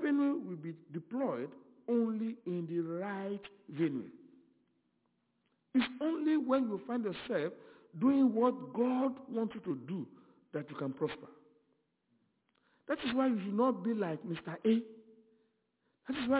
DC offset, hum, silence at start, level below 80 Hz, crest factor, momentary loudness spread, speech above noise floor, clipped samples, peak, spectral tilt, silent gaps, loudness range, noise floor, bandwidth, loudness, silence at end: under 0.1%; none; 0 s; -76 dBFS; 18 dB; 13 LU; 46 dB; under 0.1%; -16 dBFS; -5.5 dB/octave; none; 8 LU; -79 dBFS; 4 kHz; -35 LUFS; 0 s